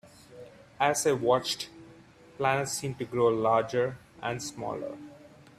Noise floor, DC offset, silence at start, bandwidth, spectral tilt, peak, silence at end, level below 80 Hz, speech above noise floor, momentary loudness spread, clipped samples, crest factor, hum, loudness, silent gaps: -54 dBFS; under 0.1%; 0.05 s; 15 kHz; -4 dB/octave; -10 dBFS; 0.3 s; -66 dBFS; 26 dB; 18 LU; under 0.1%; 20 dB; none; -29 LUFS; none